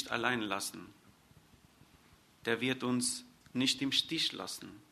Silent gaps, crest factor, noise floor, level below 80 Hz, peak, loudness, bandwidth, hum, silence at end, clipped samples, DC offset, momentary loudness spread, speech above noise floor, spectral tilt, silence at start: none; 24 dB; -64 dBFS; -72 dBFS; -14 dBFS; -34 LUFS; 13.5 kHz; none; 0.15 s; under 0.1%; under 0.1%; 12 LU; 29 dB; -2.5 dB/octave; 0 s